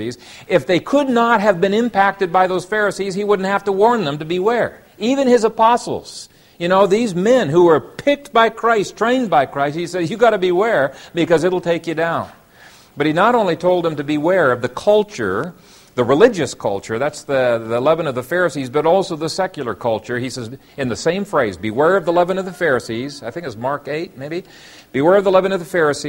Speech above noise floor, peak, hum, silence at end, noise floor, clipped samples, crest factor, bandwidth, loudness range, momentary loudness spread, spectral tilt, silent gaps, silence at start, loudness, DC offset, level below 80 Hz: 29 dB; 0 dBFS; none; 0 s; -45 dBFS; under 0.1%; 16 dB; 16.5 kHz; 4 LU; 11 LU; -5.5 dB/octave; none; 0 s; -17 LUFS; under 0.1%; -54 dBFS